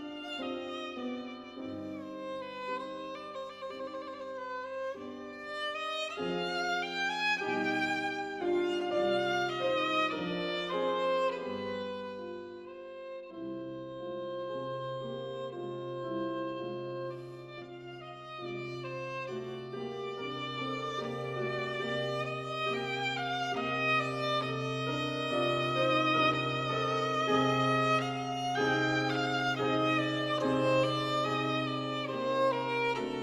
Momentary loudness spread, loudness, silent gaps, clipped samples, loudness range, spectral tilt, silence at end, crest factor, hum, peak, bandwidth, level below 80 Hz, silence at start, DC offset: 13 LU; -33 LUFS; none; under 0.1%; 11 LU; -5 dB/octave; 0 s; 18 dB; none; -16 dBFS; 13.5 kHz; -68 dBFS; 0 s; under 0.1%